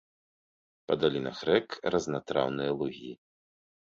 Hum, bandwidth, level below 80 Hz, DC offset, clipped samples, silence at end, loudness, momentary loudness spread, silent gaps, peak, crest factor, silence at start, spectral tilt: none; 7.8 kHz; -64 dBFS; under 0.1%; under 0.1%; 0.85 s; -30 LUFS; 7 LU; none; -10 dBFS; 22 dB; 0.9 s; -5.5 dB/octave